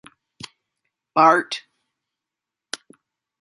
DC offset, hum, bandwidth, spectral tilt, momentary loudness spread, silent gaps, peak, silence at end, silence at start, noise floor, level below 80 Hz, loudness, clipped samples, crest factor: under 0.1%; none; 11.5 kHz; -3.5 dB/octave; 25 LU; none; -2 dBFS; 1.85 s; 1.15 s; -86 dBFS; -74 dBFS; -19 LUFS; under 0.1%; 24 dB